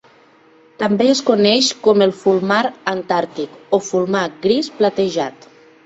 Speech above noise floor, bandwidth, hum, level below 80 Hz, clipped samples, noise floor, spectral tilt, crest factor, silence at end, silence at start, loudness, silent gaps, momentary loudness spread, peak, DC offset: 33 dB; 8 kHz; none; -62 dBFS; under 0.1%; -49 dBFS; -4 dB/octave; 16 dB; 0.55 s; 0.8 s; -17 LUFS; none; 9 LU; -2 dBFS; under 0.1%